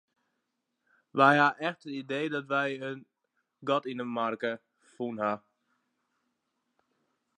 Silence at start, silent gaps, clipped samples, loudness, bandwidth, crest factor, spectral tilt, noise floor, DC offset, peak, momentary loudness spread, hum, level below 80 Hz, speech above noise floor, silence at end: 1.15 s; none; under 0.1%; -29 LUFS; 10 kHz; 24 dB; -6 dB/octave; -82 dBFS; under 0.1%; -8 dBFS; 17 LU; none; -86 dBFS; 53 dB; 2 s